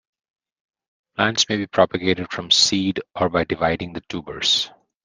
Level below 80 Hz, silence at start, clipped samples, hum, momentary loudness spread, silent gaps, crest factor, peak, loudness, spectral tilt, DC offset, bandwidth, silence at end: -54 dBFS; 1.2 s; under 0.1%; none; 15 LU; none; 20 dB; -2 dBFS; -20 LUFS; -3 dB/octave; under 0.1%; 10 kHz; 0.35 s